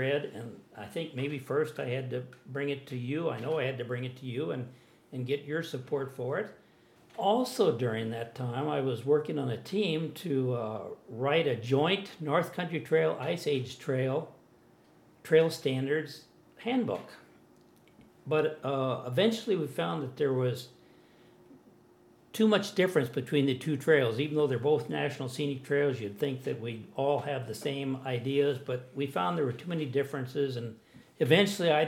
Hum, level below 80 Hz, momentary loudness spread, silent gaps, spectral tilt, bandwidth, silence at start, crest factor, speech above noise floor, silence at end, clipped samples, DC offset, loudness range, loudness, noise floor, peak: none; -78 dBFS; 12 LU; none; -6 dB/octave; 16.5 kHz; 0 s; 26 dB; 30 dB; 0 s; under 0.1%; under 0.1%; 6 LU; -31 LUFS; -61 dBFS; -6 dBFS